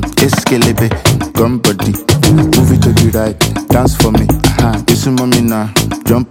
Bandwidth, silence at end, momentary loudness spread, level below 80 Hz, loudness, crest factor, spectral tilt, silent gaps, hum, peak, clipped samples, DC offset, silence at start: 17.5 kHz; 0.05 s; 5 LU; -24 dBFS; -11 LUFS; 10 dB; -5 dB/octave; none; none; 0 dBFS; under 0.1%; under 0.1%; 0 s